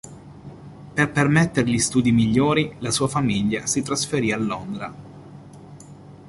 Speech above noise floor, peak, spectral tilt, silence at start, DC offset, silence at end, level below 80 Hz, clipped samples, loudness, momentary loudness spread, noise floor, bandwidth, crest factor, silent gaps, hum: 22 dB; -4 dBFS; -4.5 dB/octave; 0.05 s; under 0.1%; 0 s; -50 dBFS; under 0.1%; -21 LUFS; 23 LU; -43 dBFS; 11.5 kHz; 18 dB; none; none